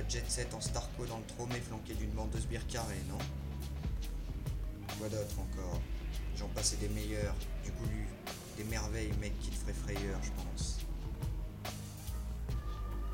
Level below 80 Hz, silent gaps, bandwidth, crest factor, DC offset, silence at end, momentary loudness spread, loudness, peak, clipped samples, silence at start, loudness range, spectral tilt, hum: -40 dBFS; none; 16.5 kHz; 18 dB; under 0.1%; 0 s; 6 LU; -40 LUFS; -20 dBFS; under 0.1%; 0 s; 3 LU; -4.5 dB/octave; none